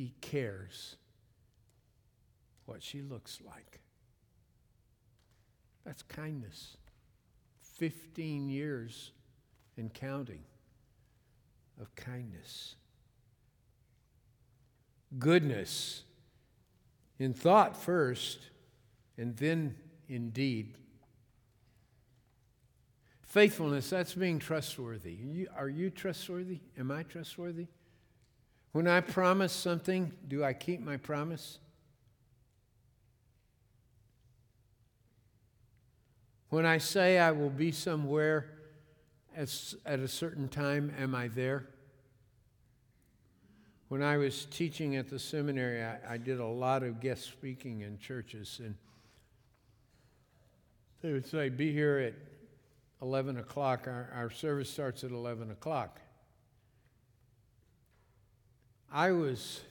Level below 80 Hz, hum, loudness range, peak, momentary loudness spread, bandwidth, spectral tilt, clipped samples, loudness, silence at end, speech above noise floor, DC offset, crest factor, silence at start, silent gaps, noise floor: -72 dBFS; none; 19 LU; -12 dBFS; 19 LU; 19.5 kHz; -5.5 dB/octave; under 0.1%; -34 LUFS; 0 s; 36 dB; under 0.1%; 26 dB; 0 s; none; -71 dBFS